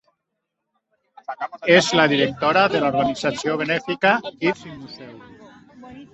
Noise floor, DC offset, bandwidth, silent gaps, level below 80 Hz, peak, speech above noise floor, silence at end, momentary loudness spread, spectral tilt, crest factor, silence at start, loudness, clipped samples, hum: -79 dBFS; under 0.1%; 8.2 kHz; none; -58 dBFS; -2 dBFS; 59 dB; 0.1 s; 21 LU; -4.5 dB/octave; 20 dB; 1.3 s; -19 LUFS; under 0.1%; none